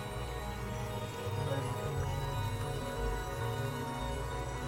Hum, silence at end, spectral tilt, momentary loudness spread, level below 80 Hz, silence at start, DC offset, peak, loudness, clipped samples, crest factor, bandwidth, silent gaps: none; 0 s; -5.5 dB/octave; 4 LU; -44 dBFS; 0 s; under 0.1%; -24 dBFS; -38 LUFS; under 0.1%; 14 dB; 16.5 kHz; none